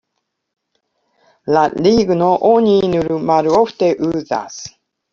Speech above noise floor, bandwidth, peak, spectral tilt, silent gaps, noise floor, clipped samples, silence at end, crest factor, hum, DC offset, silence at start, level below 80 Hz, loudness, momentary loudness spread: 59 dB; 7.4 kHz; -2 dBFS; -6 dB/octave; none; -73 dBFS; under 0.1%; 0.45 s; 14 dB; none; under 0.1%; 1.45 s; -50 dBFS; -15 LUFS; 14 LU